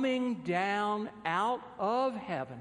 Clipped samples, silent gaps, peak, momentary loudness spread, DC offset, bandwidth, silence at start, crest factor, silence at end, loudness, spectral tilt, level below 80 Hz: under 0.1%; none; -18 dBFS; 4 LU; under 0.1%; 11 kHz; 0 s; 16 dB; 0 s; -32 LUFS; -6 dB/octave; -72 dBFS